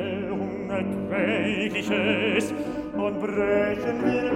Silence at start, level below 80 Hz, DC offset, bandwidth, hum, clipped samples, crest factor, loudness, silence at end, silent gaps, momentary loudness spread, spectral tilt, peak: 0 s; -54 dBFS; under 0.1%; 14.5 kHz; none; under 0.1%; 16 dB; -26 LUFS; 0 s; none; 6 LU; -6 dB/octave; -10 dBFS